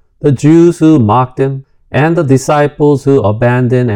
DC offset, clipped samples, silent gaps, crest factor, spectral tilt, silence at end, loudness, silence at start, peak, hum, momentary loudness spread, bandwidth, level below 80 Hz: under 0.1%; 2%; none; 10 dB; -7.5 dB/octave; 0 s; -10 LUFS; 0.25 s; 0 dBFS; none; 8 LU; 13.5 kHz; -42 dBFS